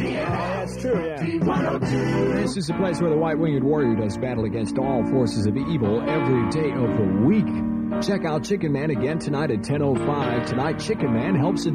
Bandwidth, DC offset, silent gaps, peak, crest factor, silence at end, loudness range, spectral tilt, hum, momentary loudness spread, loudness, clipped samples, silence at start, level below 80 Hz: 12 kHz; under 0.1%; none; -8 dBFS; 14 dB; 0 s; 2 LU; -7 dB/octave; none; 4 LU; -23 LUFS; under 0.1%; 0 s; -46 dBFS